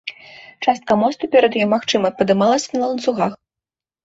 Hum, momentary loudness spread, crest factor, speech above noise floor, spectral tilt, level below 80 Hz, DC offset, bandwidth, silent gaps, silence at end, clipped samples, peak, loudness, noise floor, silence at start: none; 7 LU; 16 dB; 72 dB; -4.5 dB/octave; -60 dBFS; under 0.1%; 8 kHz; none; 0.7 s; under 0.1%; -2 dBFS; -18 LUFS; -89 dBFS; 0.05 s